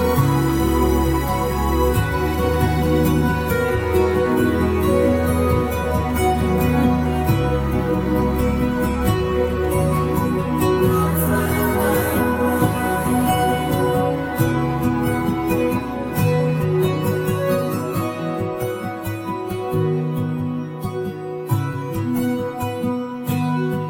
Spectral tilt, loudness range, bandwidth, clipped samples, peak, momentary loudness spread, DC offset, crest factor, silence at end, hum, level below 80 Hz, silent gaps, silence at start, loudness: -6.5 dB/octave; 5 LU; 17 kHz; under 0.1%; -4 dBFS; 7 LU; under 0.1%; 14 dB; 0 s; none; -30 dBFS; none; 0 s; -20 LUFS